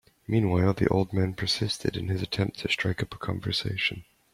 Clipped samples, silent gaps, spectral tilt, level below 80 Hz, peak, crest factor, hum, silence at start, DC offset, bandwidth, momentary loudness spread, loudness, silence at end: under 0.1%; none; -5.5 dB/octave; -52 dBFS; -8 dBFS; 20 dB; none; 0.3 s; under 0.1%; 14.5 kHz; 7 LU; -27 LUFS; 0.3 s